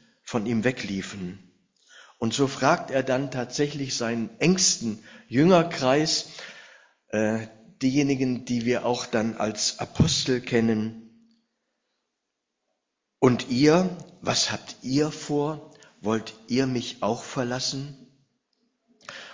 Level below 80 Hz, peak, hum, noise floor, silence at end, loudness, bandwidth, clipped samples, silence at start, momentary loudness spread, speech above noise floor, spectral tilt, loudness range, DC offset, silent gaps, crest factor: -54 dBFS; -4 dBFS; none; -82 dBFS; 0 s; -25 LUFS; 7.6 kHz; under 0.1%; 0.25 s; 13 LU; 57 dB; -4.5 dB/octave; 5 LU; under 0.1%; none; 22 dB